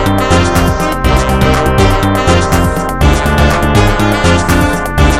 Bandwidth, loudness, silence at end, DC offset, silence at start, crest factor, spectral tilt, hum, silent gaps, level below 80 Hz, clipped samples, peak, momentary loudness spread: 16.5 kHz; -10 LUFS; 0 s; 3%; 0 s; 10 dB; -5.5 dB/octave; none; none; -16 dBFS; under 0.1%; 0 dBFS; 2 LU